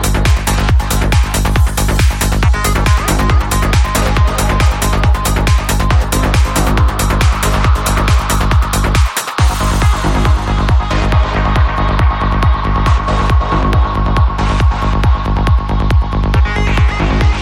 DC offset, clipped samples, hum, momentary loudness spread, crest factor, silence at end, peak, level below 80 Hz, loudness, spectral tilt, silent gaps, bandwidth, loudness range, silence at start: under 0.1%; under 0.1%; none; 1 LU; 10 dB; 0 s; 0 dBFS; -14 dBFS; -13 LUFS; -5 dB/octave; none; 17 kHz; 1 LU; 0 s